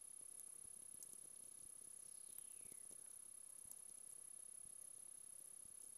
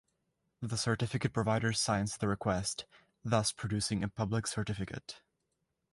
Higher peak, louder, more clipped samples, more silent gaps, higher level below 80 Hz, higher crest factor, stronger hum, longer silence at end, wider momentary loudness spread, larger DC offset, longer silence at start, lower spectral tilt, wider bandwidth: second, -34 dBFS vs -14 dBFS; second, -55 LUFS vs -34 LUFS; neither; neither; second, -90 dBFS vs -56 dBFS; first, 26 dB vs 20 dB; neither; second, 0 s vs 0.75 s; second, 2 LU vs 14 LU; neither; second, 0 s vs 0.6 s; second, 0 dB/octave vs -4.5 dB/octave; first, 16 kHz vs 11.5 kHz